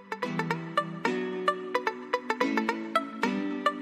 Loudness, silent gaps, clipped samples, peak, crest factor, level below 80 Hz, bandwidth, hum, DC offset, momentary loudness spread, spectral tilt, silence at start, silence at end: -30 LUFS; none; under 0.1%; -10 dBFS; 22 dB; -80 dBFS; 15.5 kHz; none; under 0.1%; 3 LU; -5.5 dB/octave; 0 s; 0 s